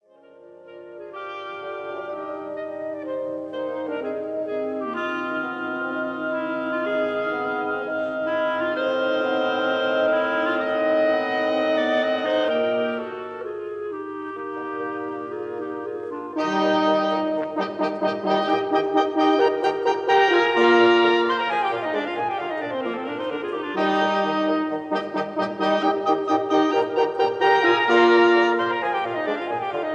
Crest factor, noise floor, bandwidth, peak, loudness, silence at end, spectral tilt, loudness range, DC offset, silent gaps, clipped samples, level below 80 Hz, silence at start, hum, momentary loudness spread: 18 dB; -49 dBFS; 7.8 kHz; -6 dBFS; -23 LUFS; 0 s; -5 dB/octave; 10 LU; under 0.1%; none; under 0.1%; -78 dBFS; 0.45 s; none; 14 LU